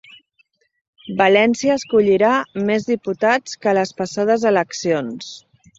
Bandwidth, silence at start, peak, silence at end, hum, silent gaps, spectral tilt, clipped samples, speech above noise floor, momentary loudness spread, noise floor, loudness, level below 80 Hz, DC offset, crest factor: 8 kHz; 1.05 s; -2 dBFS; 0.4 s; none; none; -4.5 dB/octave; under 0.1%; 45 dB; 9 LU; -62 dBFS; -18 LUFS; -60 dBFS; under 0.1%; 16 dB